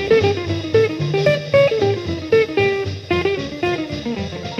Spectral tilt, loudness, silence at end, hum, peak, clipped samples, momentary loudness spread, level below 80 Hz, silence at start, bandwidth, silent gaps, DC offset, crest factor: -6.5 dB/octave; -18 LUFS; 0 s; none; -2 dBFS; under 0.1%; 8 LU; -44 dBFS; 0 s; 9 kHz; none; under 0.1%; 16 dB